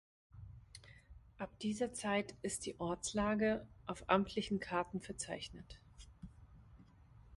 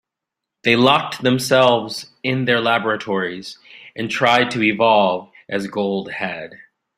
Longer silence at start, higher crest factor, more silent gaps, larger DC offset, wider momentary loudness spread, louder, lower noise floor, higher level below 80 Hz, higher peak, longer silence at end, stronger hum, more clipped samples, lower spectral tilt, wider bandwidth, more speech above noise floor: second, 0.35 s vs 0.65 s; first, 26 dB vs 18 dB; neither; neither; first, 23 LU vs 15 LU; second, -39 LUFS vs -18 LUFS; second, -62 dBFS vs -83 dBFS; about the same, -62 dBFS vs -62 dBFS; second, -16 dBFS vs 0 dBFS; second, 0 s vs 0.4 s; neither; neither; about the same, -4.5 dB/octave vs -4.5 dB/octave; second, 11.5 kHz vs 16 kHz; second, 23 dB vs 65 dB